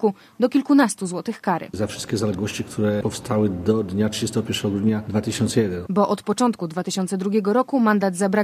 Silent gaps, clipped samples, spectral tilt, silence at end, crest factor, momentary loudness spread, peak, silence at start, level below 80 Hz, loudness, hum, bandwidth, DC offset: none; under 0.1%; -5.5 dB/octave; 0 s; 16 dB; 7 LU; -4 dBFS; 0 s; -50 dBFS; -22 LUFS; none; 15.5 kHz; under 0.1%